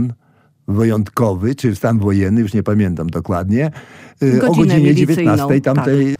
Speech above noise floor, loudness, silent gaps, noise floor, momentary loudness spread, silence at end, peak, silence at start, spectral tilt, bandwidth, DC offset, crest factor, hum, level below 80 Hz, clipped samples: 40 dB; -15 LUFS; none; -54 dBFS; 8 LU; 0.05 s; -2 dBFS; 0 s; -8 dB/octave; 16 kHz; under 0.1%; 12 dB; none; -46 dBFS; under 0.1%